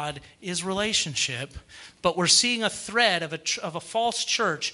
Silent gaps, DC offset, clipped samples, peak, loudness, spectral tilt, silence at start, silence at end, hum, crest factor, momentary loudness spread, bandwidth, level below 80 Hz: none; under 0.1%; under 0.1%; -6 dBFS; -24 LUFS; -2 dB/octave; 0 s; 0 s; none; 22 dB; 15 LU; 12 kHz; -56 dBFS